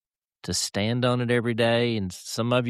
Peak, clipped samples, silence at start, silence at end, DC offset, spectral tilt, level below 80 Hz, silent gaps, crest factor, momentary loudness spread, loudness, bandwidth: -8 dBFS; under 0.1%; 0.45 s; 0 s; under 0.1%; -4.5 dB/octave; -58 dBFS; none; 16 dB; 8 LU; -25 LUFS; 14 kHz